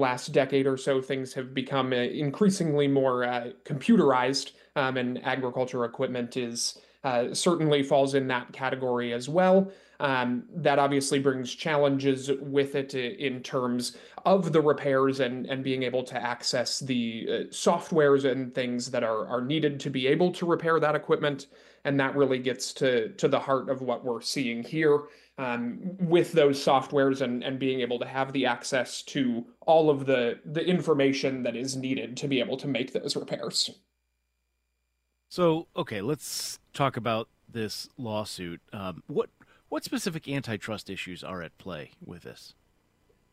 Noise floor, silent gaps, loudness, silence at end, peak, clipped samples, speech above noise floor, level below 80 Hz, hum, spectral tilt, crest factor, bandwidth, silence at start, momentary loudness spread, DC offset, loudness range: -78 dBFS; none; -27 LUFS; 0.85 s; -10 dBFS; under 0.1%; 51 dB; -70 dBFS; none; -5 dB/octave; 18 dB; 16 kHz; 0 s; 11 LU; under 0.1%; 7 LU